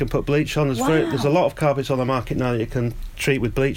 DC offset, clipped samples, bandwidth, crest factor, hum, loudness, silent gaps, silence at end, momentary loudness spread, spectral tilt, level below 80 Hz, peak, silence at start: under 0.1%; under 0.1%; 17 kHz; 14 dB; none; -21 LUFS; none; 0 s; 5 LU; -6 dB/octave; -36 dBFS; -6 dBFS; 0 s